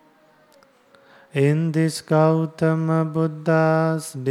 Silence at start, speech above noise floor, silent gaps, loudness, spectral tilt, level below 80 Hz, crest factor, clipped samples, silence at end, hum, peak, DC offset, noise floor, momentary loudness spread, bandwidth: 1.35 s; 36 dB; none; -21 LUFS; -7 dB/octave; -68 dBFS; 16 dB; under 0.1%; 0 s; none; -4 dBFS; under 0.1%; -56 dBFS; 5 LU; 13 kHz